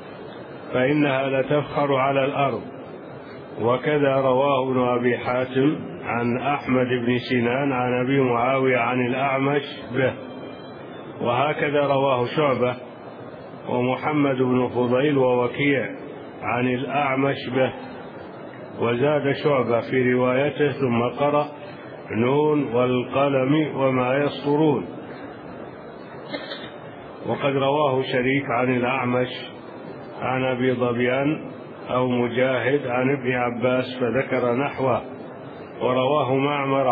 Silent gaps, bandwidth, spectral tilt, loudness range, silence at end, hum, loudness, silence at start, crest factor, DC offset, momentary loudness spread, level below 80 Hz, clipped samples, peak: none; 5 kHz; -10 dB/octave; 3 LU; 0 s; none; -22 LUFS; 0 s; 16 dB; under 0.1%; 17 LU; -62 dBFS; under 0.1%; -8 dBFS